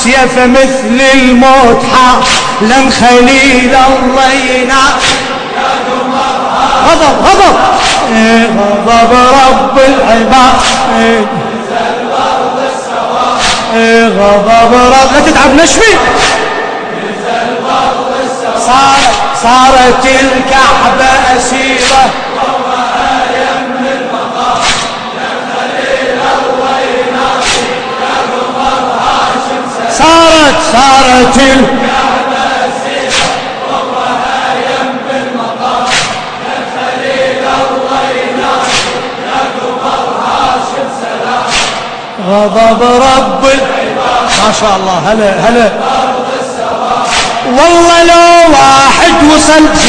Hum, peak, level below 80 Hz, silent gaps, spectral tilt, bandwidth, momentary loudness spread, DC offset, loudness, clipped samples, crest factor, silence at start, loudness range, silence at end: none; 0 dBFS; -28 dBFS; none; -3 dB/octave; 11 kHz; 10 LU; under 0.1%; -7 LUFS; 6%; 6 dB; 0 s; 6 LU; 0 s